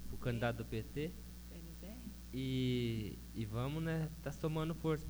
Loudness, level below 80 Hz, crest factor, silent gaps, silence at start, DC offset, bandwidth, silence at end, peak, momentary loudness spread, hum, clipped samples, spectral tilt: -41 LUFS; -52 dBFS; 16 dB; none; 0 s; under 0.1%; over 20 kHz; 0 s; -24 dBFS; 13 LU; 60 Hz at -50 dBFS; under 0.1%; -6.5 dB/octave